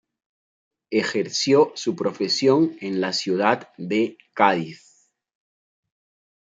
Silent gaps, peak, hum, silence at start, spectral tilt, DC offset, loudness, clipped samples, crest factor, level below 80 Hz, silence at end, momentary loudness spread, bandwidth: none; -2 dBFS; none; 0.9 s; -4.5 dB/octave; under 0.1%; -22 LUFS; under 0.1%; 22 dB; -72 dBFS; 1.75 s; 8 LU; 9.2 kHz